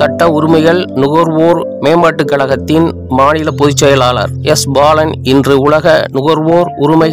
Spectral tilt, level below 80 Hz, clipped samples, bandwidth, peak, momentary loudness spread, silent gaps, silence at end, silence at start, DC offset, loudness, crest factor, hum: -5.5 dB/octave; -38 dBFS; 3%; 16.5 kHz; 0 dBFS; 4 LU; none; 0 s; 0 s; 0.5%; -9 LUFS; 8 dB; none